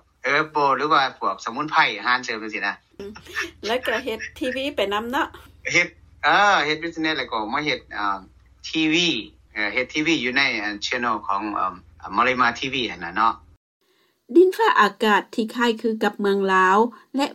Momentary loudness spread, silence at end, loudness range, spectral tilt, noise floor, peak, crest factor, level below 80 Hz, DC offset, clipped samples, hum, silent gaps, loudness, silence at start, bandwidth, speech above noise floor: 11 LU; 0 s; 4 LU; -3.5 dB/octave; -59 dBFS; -6 dBFS; 18 dB; -56 dBFS; under 0.1%; under 0.1%; none; 13.57-13.80 s; -21 LUFS; 0.25 s; 15.5 kHz; 37 dB